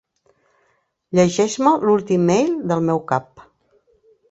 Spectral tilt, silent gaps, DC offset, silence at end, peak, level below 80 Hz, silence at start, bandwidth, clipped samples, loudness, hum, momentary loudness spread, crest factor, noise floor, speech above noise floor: -6 dB/octave; none; under 0.1%; 0.9 s; -2 dBFS; -58 dBFS; 1.1 s; 8.2 kHz; under 0.1%; -18 LUFS; none; 6 LU; 18 dB; -65 dBFS; 48 dB